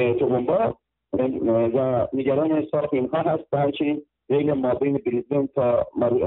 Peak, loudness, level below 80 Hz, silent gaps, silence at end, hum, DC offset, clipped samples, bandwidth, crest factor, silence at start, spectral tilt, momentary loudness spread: -10 dBFS; -23 LUFS; -56 dBFS; none; 0 s; none; under 0.1%; under 0.1%; 4.1 kHz; 12 dB; 0 s; -12 dB/octave; 5 LU